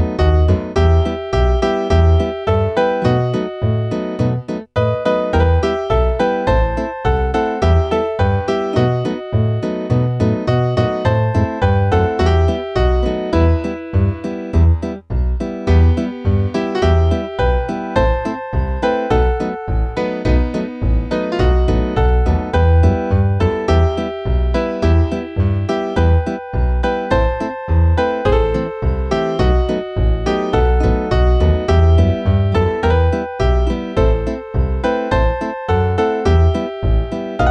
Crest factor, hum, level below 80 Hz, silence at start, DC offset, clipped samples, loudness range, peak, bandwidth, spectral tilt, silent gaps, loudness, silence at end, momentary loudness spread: 14 dB; none; -20 dBFS; 0 s; under 0.1%; under 0.1%; 2 LU; -2 dBFS; 7.6 kHz; -8 dB/octave; none; -17 LUFS; 0 s; 6 LU